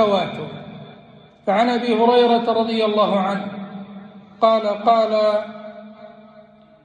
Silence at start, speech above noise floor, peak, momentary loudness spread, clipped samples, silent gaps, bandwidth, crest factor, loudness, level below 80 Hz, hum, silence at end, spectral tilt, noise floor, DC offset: 0 s; 30 dB; -4 dBFS; 22 LU; under 0.1%; none; 9.4 kHz; 16 dB; -18 LUFS; -68 dBFS; none; 0.45 s; -6.5 dB/octave; -47 dBFS; under 0.1%